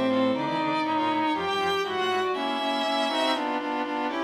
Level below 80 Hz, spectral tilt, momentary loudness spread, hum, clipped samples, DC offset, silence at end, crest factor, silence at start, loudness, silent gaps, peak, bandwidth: -68 dBFS; -4 dB/octave; 4 LU; none; under 0.1%; under 0.1%; 0 s; 14 dB; 0 s; -26 LUFS; none; -12 dBFS; 15 kHz